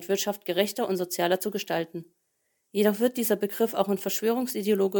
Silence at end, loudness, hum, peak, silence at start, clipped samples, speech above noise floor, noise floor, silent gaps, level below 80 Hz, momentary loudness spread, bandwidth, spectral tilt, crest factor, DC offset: 0 s; -27 LUFS; none; -8 dBFS; 0 s; under 0.1%; 49 dB; -75 dBFS; none; -76 dBFS; 5 LU; 19 kHz; -4 dB/octave; 18 dB; under 0.1%